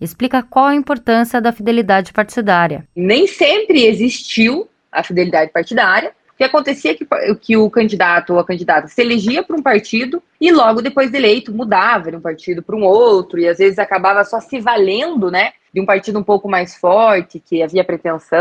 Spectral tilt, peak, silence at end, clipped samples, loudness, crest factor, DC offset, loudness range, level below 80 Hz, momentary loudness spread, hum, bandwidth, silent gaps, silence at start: -5 dB/octave; 0 dBFS; 0 s; under 0.1%; -14 LUFS; 14 dB; under 0.1%; 2 LU; -56 dBFS; 7 LU; none; 14.5 kHz; none; 0 s